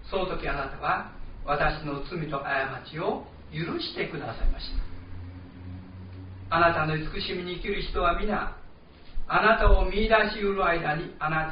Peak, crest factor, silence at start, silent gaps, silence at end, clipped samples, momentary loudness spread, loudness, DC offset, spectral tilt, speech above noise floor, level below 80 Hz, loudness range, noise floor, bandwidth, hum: -8 dBFS; 20 dB; 0 s; none; 0 s; under 0.1%; 20 LU; -27 LUFS; 0.1%; -3.5 dB/octave; 21 dB; -34 dBFS; 9 LU; -47 dBFS; 5.2 kHz; none